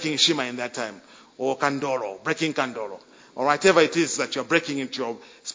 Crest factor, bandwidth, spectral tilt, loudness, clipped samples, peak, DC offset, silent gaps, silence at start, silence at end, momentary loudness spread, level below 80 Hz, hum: 22 dB; 7.8 kHz; -3 dB/octave; -24 LUFS; under 0.1%; -2 dBFS; under 0.1%; none; 0 s; 0 s; 16 LU; -68 dBFS; none